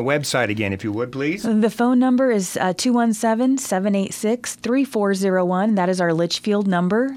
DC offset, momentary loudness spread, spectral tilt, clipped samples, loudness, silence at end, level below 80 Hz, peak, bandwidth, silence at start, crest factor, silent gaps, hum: under 0.1%; 6 LU; -5 dB/octave; under 0.1%; -20 LUFS; 0 s; -62 dBFS; -6 dBFS; 16.5 kHz; 0 s; 14 dB; none; none